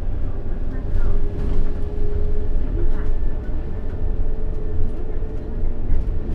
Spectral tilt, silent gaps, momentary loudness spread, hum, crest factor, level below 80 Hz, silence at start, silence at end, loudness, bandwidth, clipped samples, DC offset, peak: -9.5 dB/octave; none; 4 LU; none; 12 dB; -20 dBFS; 0 s; 0 s; -28 LUFS; 2.2 kHz; under 0.1%; under 0.1%; -4 dBFS